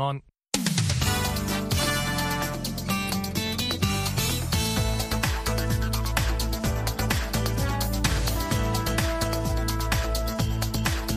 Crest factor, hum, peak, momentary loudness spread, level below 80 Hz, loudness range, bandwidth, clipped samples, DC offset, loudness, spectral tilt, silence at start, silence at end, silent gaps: 20 dB; none; -6 dBFS; 3 LU; -32 dBFS; 0 LU; 15.5 kHz; under 0.1%; under 0.1%; -26 LUFS; -4 dB/octave; 0 s; 0 s; none